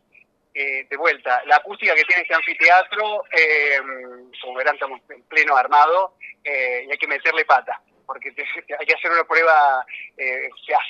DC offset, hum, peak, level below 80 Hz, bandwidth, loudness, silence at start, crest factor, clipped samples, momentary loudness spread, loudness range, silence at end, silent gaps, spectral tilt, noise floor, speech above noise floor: under 0.1%; none; 0 dBFS; -78 dBFS; 7.4 kHz; -18 LUFS; 0.55 s; 20 dB; under 0.1%; 17 LU; 3 LU; 0 s; none; -1 dB/octave; -57 dBFS; 37 dB